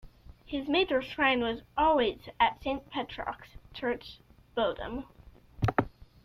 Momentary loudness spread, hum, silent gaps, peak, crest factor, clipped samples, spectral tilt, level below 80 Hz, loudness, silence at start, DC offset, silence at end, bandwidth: 15 LU; none; none; -10 dBFS; 20 dB; under 0.1%; -7 dB/octave; -52 dBFS; -30 LUFS; 0.05 s; under 0.1%; 0.2 s; 14.5 kHz